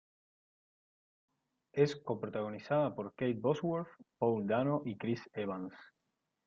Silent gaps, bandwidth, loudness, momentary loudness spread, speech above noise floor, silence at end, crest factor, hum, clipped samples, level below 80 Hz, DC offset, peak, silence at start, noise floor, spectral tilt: none; 7.6 kHz; -36 LUFS; 8 LU; 50 dB; 0.6 s; 22 dB; none; under 0.1%; -76 dBFS; under 0.1%; -16 dBFS; 1.75 s; -85 dBFS; -8 dB/octave